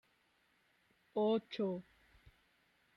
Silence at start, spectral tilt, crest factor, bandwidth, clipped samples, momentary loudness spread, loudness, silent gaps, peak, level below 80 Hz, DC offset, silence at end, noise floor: 1.15 s; -8 dB/octave; 16 dB; 6.2 kHz; under 0.1%; 9 LU; -38 LUFS; none; -26 dBFS; -78 dBFS; under 0.1%; 1.15 s; -76 dBFS